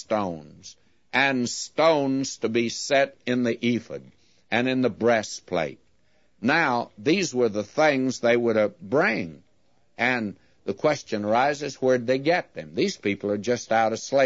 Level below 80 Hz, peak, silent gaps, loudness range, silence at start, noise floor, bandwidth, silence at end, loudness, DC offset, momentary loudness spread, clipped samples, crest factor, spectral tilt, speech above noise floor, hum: -68 dBFS; -6 dBFS; none; 2 LU; 0 s; -67 dBFS; 8 kHz; 0 s; -24 LUFS; under 0.1%; 8 LU; under 0.1%; 18 dB; -4.5 dB/octave; 44 dB; none